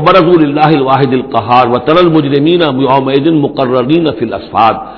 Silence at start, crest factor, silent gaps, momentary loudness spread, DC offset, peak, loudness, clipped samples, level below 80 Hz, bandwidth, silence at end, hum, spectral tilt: 0 s; 8 dB; none; 4 LU; under 0.1%; 0 dBFS; -9 LUFS; 2%; -40 dBFS; 5.4 kHz; 0 s; none; -9 dB/octave